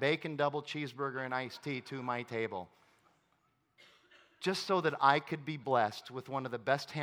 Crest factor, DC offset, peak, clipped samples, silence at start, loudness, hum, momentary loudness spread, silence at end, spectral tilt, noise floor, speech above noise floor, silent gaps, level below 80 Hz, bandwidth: 24 dB; under 0.1%; -12 dBFS; under 0.1%; 0 s; -35 LUFS; none; 11 LU; 0 s; -5 dB/octave; -76 dBFS; 41 dB; none; -86 dBFS; 18 kHz